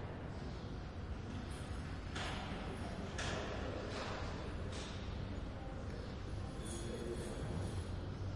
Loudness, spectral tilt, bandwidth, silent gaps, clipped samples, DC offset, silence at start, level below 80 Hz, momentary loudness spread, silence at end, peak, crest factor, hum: -45 LUFS; -5.5 dB/octave; 11.5 kHz; none; under 0.1%; under 0.1%; 0 s; -50 dBFS; 4 LU; 0 s; -30 dBFS; 14 dB; none